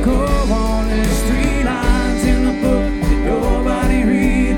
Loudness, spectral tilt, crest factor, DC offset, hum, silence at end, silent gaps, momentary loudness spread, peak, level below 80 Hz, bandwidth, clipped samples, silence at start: -17 LUFS; -6 dB/octave; 12 dB; under 0.1%; none; 0 s; none; 3 LU; -2 dBFS; -18 dBFS; 16 kHz; under 0.1%; 0 s